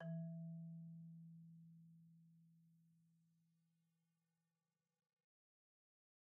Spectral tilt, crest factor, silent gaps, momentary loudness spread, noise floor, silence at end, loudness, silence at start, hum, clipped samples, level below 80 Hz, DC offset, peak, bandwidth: -11 dB/octave; 16 dB; none; 17 LU; under -90 dBFS; 3.1 s; -56 LUFS; 0 s; none; under 0.1%; under -90 dBFS; under 0.1%; -42 dBFS; 1.7 kHz